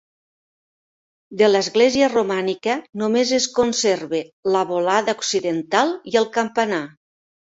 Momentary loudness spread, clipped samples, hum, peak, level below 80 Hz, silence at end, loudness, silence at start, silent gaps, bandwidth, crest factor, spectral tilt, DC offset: 8 LU; under 0.1%; none; -2 dBFS; -62 dBFS; 0.7 s; -20 LUFS; 1.3 s; 4.33-4.43 s; 8 kHz; 18 dB; -3 dB/octave; under 0.1%